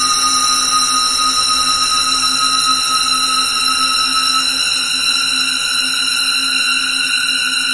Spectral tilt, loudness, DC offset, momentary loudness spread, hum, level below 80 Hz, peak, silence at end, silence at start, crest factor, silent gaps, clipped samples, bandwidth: 1.5 dB/octave; -12 LUFS; under 0.1%; 2 LU; none; -48 dBFS; -2 dBFS; 0 s; 0 s; 12 dB; none; under 0.1%; 11.5 kHz